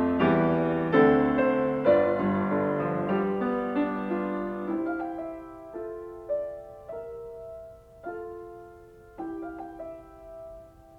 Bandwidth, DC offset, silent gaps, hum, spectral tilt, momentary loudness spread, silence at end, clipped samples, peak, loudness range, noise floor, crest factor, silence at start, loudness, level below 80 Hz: 5.4 kHz; under 0.1%; none; none; -9 dB/octave; 21 LU; 0 s; under 0.1%; -8 dBFS; 17 LU; -50 dBFS; 20 dB; 0 s; -26 LUFS; -56 dBFS